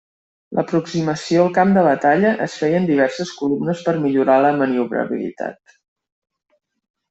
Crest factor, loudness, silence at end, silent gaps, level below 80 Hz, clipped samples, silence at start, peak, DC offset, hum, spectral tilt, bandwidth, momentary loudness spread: 16 dB; -18 LUFS; 1.55 s; none; -62 dBFS; under 0.1%; 0.5 s; -2 dBFS; under 0.1%; none; -6.5 dB/octave; 8.2 kHz; 10 LU